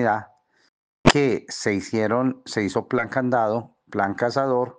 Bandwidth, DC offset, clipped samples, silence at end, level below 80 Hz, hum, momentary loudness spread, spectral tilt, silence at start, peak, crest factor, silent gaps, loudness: 9.8 kHz; under 0.1%; under 0.1%; 0.05 s; -46 dBFS; none; 7 LU; -5 dB/octave; 0 s; -2 dBFS; 20 dB; 0.69-1.04 s; -23 LUFS